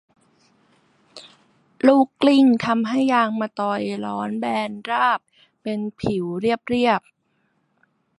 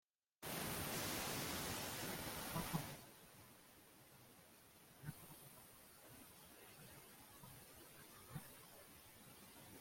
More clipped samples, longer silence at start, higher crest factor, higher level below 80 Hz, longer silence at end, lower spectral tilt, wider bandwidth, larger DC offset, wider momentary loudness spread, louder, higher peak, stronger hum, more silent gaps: neither; first, 1.15 s vs 0.4 s; about the same, 20 dB vs 24 dB; first, -60 dBFS vs -70 dBFS; first, 1.2 s vs 0 s; first, -6 dB/octave vs -3 dB/octave; second, 11 kHz vs 16.5 kHz; neither; second, 10 LU vs 20 LU; first, -21 LUFS vs -49 LUFS; first, -2 dBFS vs -28 dBFS; neither; neither